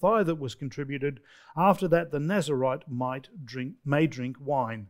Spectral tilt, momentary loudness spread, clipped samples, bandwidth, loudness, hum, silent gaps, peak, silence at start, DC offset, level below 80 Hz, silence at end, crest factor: -7 dB/octave; 13 LU; under 0.1%; 16 kHz; -28 LUFS; none; none; -8 dBFS; 0 s; under 0.1%; -60 dBFS; 0 s; 20 dB